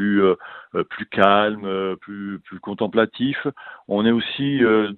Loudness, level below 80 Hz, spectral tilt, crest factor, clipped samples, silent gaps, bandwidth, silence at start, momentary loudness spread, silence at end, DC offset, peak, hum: -21 LUFS; -60 dBFS; -8.5 dB/octave; 20 dB; under 0.1%; none; 4.4 kHz; 0 s; 15 LU; 0 s; under 0.1%; 0 dBFS; none